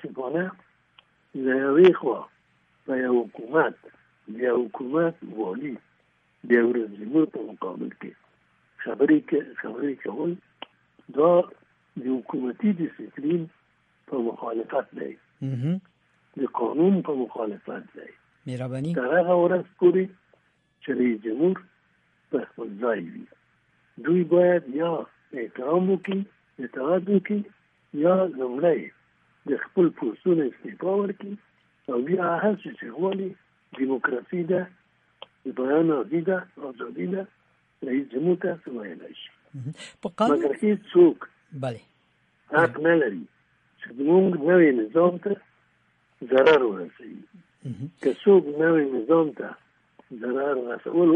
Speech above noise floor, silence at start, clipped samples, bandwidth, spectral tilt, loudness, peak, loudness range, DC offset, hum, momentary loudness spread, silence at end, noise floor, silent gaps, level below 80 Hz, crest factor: 42 dB; 0 s; under 0.1%; 8.6 kHz; -8.5 dB/octave; -24 LUFS; -6 dBFS; 6 LU; under 0.1%; none; 19 LU; 0 s; -66 dBFS; none; -76 dBFS; 18 dB